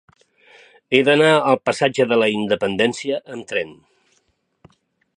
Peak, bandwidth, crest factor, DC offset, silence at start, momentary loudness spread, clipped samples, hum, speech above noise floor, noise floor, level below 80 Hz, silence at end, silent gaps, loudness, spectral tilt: 0 dBFS; 11 kHz; 20 dB; under 0.1%; 0.9 s; 12 LU; under 0.1%; none; 48 dB; -66 dBFS; -62 dBFS; 1.45 s; none; -18 LUFS; -4.5 dB/octave